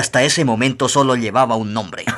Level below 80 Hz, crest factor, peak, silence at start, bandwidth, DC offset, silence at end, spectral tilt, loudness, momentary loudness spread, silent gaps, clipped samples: -56 dBFS; 14 dB; -2 dBFS; 0 s; 13 kHz; under 0.1%; 0 s; -4 dB/octave; -16 LUFS; 7 LU; none; under 0.1%